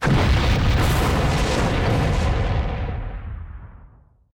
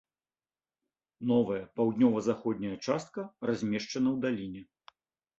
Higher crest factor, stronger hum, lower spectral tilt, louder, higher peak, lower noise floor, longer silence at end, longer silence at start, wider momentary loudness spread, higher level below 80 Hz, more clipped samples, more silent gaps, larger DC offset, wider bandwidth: second, 8 dB vs 18 dB; neither; about the same, -6 dB/octave vs -6.5 dB/octave; first, -21 LUFS vs -31 LUFS; about the same, -12 dBFS vs -14 dBFS; second, -50 dBFS vs under -90 dBFS; second, 0.5 s vs 0.75 s; second, 0 s vs 1.2 s; first, 16 LU vs 11 LU; first, -24 dBFS vs -68 dBFS; neither; neither; neither; first, 17 kHz vs 7.8 kHz